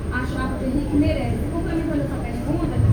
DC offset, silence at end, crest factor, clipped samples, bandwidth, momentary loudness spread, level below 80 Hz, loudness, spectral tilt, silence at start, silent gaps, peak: under 0.1%; 0 s; 14 dB; under 0.1%; over 20 kHz; 5 LU; -30 dBFS; -23 LUFS; -8 dB/octave; 0 s; none; -8 dBFS